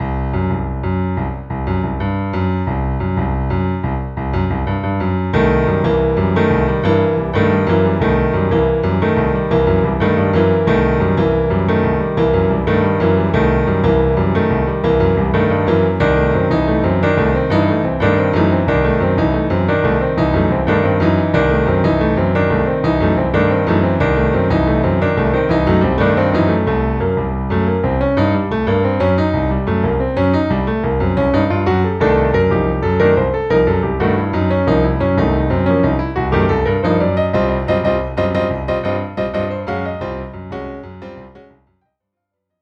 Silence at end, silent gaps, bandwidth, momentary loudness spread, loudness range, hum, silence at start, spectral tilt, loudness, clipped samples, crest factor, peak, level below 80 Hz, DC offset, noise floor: 1.2 s; none; 7.2 kHz; 5 LU; 4 LU; none; 0 s; -9.5 dB/octave; -16 LUFS; under 0.1%; 14 dB; 0 dBFS; -28 dBFS; under 0.1%; -77 dBFS